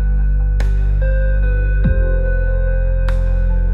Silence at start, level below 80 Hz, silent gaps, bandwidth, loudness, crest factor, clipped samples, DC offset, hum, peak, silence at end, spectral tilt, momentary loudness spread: 0 s; -14 dBFS; none; 3.9 kHz; -18 LUFS; 10 dB; under 0.1%; under 0.1%; none; -4 dBFS; 0 s; -9 dB/octave; 2 LU